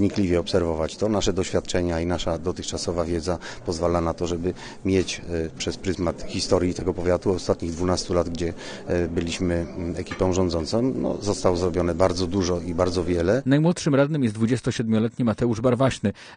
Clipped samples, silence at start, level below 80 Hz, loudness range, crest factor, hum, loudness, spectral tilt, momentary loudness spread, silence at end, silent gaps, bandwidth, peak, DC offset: under 0.1%; 0 s; -42 dBFS; 4 LU; 18 dB; none; -24 LUFS; -6 dB/octave; 7 LU; 0 s; none; 10 kHz; -4 dBFS; under 0.1%